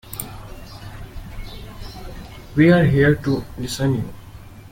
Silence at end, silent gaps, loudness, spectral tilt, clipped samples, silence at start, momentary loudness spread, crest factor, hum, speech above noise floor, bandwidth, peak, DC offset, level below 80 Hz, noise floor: 0.05 s; none; -18 LUFS; -6.5 dB/octave; under 0.1%; 0.05 s; 24 LU; 20 dB; none; 23 dB; 17 kHz; -2 dBFS; under 0.1%; -38 dBFS; -39 dBFS